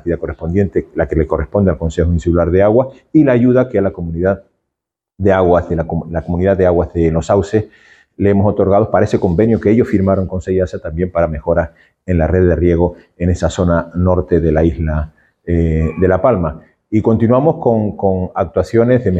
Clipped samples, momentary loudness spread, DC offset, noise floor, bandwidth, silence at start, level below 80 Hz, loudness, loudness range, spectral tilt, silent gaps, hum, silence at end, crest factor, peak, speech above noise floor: under 0.1%; 7 LU; under 0.1%; -80 dBFS; 8.2 kHz; 0.05 s; -28 dBFS; -14 LUFS; 2 LU; -9 dB/octave; none; none; 0 s; 14 dB; 0 dBFS; 67 dB